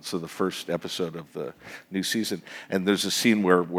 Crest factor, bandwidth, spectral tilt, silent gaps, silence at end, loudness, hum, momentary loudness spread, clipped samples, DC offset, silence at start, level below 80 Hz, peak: 22 dB; 18 kHz; -4 dB/octave; none; 0 s; -27 LUFS; none; 15 LU; under 0.1%; under 0.1%; 0.05 s; -70 dBFS; -4 dBFS